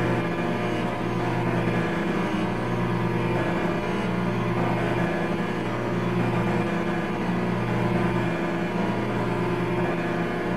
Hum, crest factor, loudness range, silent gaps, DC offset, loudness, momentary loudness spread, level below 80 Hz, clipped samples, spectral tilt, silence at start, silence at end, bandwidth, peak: 60 Hz at -35 dBFS; 12 dB; 0 LU; none; 1%; -26 LUFS; 2 LU; -46 dBFS; under 0.1%; -7.5 dB/octave; 0 s; 0 s; 13 kHz; -12 dBFS